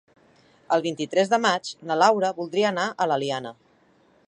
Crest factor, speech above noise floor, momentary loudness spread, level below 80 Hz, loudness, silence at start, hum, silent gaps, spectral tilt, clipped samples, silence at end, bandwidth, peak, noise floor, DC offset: 20 dB; 37 dB; 8 LU; -76 dBFS; -23 LUFS; 0.7 s; none; none; -4 dB/octave; under 0.1%; 0.75 s; 10.5 kHz; -4 dBFS; -60 dBFS; under 0.1%